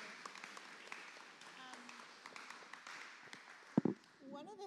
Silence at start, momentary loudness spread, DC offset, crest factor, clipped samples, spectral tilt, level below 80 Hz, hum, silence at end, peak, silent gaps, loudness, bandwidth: 0 s; 16 LU; under 0.1%; 30 dB; under 0.1%; -5.5 dB/octave; under -90 dBFS; none; 0 s; -18 dBFS; none; -48 LUFS; 13 kHz